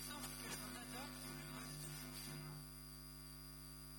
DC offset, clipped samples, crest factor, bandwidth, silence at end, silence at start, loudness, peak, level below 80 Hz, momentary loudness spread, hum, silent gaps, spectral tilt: under 0.1%; under 0.1%; 18 dB; 17.5 kHz; 0 s; 0 s; -50 LUFS; -34 dBFS; -62 dBFS; 6 LU; 50 Hz at -55 dBFS; none; -3 dB/octave